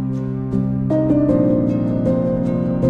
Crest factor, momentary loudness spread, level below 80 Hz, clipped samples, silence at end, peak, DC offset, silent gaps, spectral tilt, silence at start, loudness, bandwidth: 14 dB; 6 LU; -38 dBFS; under 0.1%; 0 s; -2 dBFS; under 0.1%; none; -11 dB/octave; 0 s; -18 LUFS; 6.4 kHz